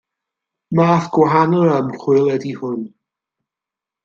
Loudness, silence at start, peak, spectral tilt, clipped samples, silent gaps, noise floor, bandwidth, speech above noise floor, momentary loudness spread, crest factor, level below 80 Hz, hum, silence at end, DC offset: -16 LUFS; 0.7 s; -2 dBFS; -8 dB/octave; under 0.1%; none; -87 dBFS; 7.2 kHz; 71 dB; 12 LU; 16 dB; -60 dBFS; none; 1.15 s; under 0.1%